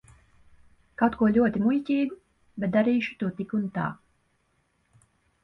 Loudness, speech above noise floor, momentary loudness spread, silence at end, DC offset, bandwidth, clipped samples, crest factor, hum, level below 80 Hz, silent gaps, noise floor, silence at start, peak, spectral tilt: -26 LUFS; 46 dB; 11 LU; 1.5 s; under 0.1%; 6 kHz; under 0.1%; 20 dB; none; -58 dBFS; none; -70 dBFS; 1 s; -8 dBFS; -8.5 dB/octave